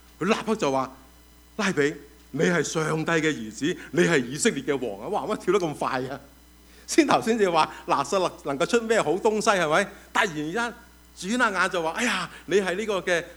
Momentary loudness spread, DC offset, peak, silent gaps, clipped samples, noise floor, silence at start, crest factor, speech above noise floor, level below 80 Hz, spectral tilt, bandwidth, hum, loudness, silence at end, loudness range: 8 LU; under 0.1%; -4 dBFS; none; under 0.1%; -52 dBFS; 0.2 s; 22 dB; 28 dB; -56 dBFS; -4 dB/octave; over 20 kHz; none; -25 LUFS; 0 s; 3 LU